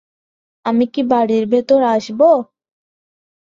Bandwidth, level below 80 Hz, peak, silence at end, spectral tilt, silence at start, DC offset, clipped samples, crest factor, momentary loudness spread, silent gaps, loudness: 7.6 kHz; -62 dBFS; -2 dBFS; 1 s; -6.5 dB/octave; 0.65 s; under 0.1%; under 0.1%; 16 dB; 6 LU; none; -15 LUFS